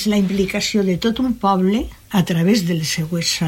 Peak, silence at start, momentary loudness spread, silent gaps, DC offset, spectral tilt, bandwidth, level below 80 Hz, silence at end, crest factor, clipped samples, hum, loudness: -4 dBFS; 0 s; 4 LU; none; under 0.1%; -5 dB/octave; 16.5 kHz; -42 dBFS; 0 s; 14 dB; under 0.1%; none; -18 LUFS